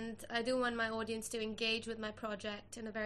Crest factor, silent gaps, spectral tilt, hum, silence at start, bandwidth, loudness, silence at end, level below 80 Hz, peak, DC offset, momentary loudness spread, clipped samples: 18 dB; none; -3 dB/octave; none; 0 s; 13 kHz; -39 LUFS; 0 s; -66 dBFS; -22 dBFS; under 0.1%; 9 LU; under 0.1%